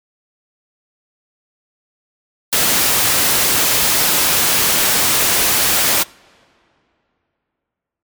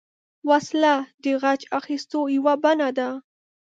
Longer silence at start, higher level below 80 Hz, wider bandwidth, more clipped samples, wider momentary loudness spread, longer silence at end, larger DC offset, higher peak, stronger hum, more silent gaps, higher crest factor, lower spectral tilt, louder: first, 2.5 s vs 0.45 s; first, -46 dBFS vs -80 dBFS; first, over 20 kHz vs 7.8 kHz; neither; second, 3 LU vs 8 LU; first, 2 s vs 0.5 s; neither; about the same, -4 dBFS vs -6 dBFS; neither; second, none vs 1.14-1.18 s; about the same, 14 dB vs 16 dB; second, 0 dB/octave vs -3.5 dB/octave; first, -12 LUFS vs -22 LUFS